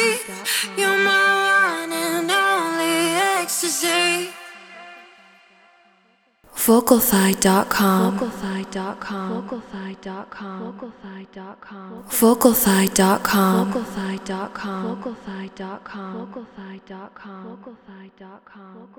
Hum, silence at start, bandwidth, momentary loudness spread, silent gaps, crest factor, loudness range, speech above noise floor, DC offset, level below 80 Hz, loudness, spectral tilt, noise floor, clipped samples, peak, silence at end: none; 0 s; over 20 kHz; 23 LU; none; 22 dB; 14 LU; 39 dB; under 0.1%; -54 dBFS; -19 LUFS; -3.5 dB/octave; -61 dBFS; under 0.1%; 0 dBFS; 0.1 s